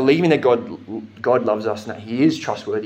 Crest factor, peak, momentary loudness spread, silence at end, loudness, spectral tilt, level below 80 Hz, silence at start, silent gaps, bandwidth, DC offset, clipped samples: 18 dB; -2 dBFS; 14 LU; 0 s; -20 LUFS; -6.5 dB/octave; -68 dBFS; 0 s; none; 9.4 kHz; under 0.1%; under 0.1%